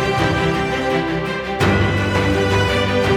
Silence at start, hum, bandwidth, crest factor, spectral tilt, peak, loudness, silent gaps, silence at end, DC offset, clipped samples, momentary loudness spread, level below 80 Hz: 0 s; none; 15 kHz; 14 dB; -6 dB/octave; -4 dBFS; -18 LUFS; none; 0 s; under 0.1%; under 0.1%; 4 LU; -32 dBFS